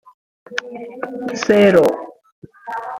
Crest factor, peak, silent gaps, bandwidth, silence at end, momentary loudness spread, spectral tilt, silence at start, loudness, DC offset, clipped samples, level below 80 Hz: 18 dB; 0 dBFS; 2.32-2.42 s; 16.5 kHz; 0 s; 21 LU; -5.5 dB/octave; 0.5 s; -16 LUFS; under 0.1%; under 0.1%; -58 dBFS